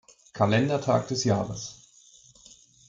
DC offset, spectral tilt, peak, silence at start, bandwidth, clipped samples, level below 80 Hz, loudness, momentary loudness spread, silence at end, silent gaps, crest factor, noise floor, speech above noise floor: under 0.1%; -5.5 dB/octave; -10 dBFS; 0.35 s; 8.8 kHz; under 0.1%; -60 dBFS; -26 LUFS; 15 LU; 1.15 s; none; 18 dB; -56 dBFS; 31 dB